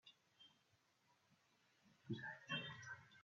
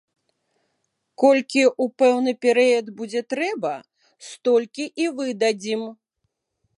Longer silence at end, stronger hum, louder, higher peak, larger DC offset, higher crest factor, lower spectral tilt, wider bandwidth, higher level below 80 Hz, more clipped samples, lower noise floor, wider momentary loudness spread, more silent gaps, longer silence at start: second, 0 s vs 0.85 s; neither; second, -50 LUFS vs -21 LUFS; second, -34 dBFS vs -4 dBFS; neither; about the same, 22 dB vs 20 dB; about the same, -2.5 dB/octave vs -3.5 dB/octave; second, 7.2 kHz vs 11 kHz; second, under -90 dBFS vs -80 dBFS; neither; first, -80 dBFS vs -76 dBFS; first, 21 LU vs 11 LU; neither; second, 0.05 s vs 1.2 s